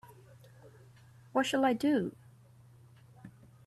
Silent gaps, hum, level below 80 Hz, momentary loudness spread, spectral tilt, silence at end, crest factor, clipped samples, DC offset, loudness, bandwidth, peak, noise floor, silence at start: none; none; -72 dBFS; 26 LU; -5 dB/octave; 0.35 s; 18 dB; under 0.1%; under 0.1%; -31 LUFS; 13.5 kHz; -18 dBFS; -59 dBFS; 0.65 s